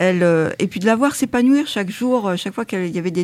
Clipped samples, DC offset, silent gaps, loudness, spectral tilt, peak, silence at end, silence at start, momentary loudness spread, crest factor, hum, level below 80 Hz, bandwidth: under 0.1%; under 0.1%; none; -18 LUFS; -5.5 dB/octave; -4 dBFS; 0 s; 0 s; 7 LU; 14 dB; none; -56 dBFS; 15 kHz